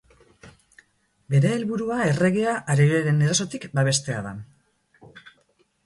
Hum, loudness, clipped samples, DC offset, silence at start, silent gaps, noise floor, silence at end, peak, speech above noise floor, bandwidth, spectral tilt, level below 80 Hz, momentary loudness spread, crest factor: none; -22 LUFS; under 0.1%; under 0.1%; 0.45 s; none; -65 dBFS; 0.55 s; -8 dBFS; 43 dB; 11.5 kHz; -5.5 dB/octave; -58 dBFS; 10 LU; 18 dB